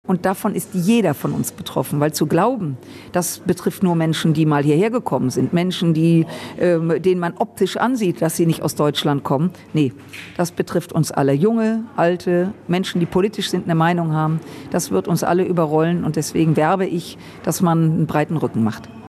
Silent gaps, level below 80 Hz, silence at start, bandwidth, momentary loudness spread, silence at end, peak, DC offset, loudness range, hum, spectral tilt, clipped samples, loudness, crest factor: none; -56 dBFS; 0.05 s; 14.5 kHz; 7 LU; 0 s; -4 dBFS; under 0.1%; 2 LU; none; -6 dB/octave; under 0.1%; -19 LUFS; 14 dB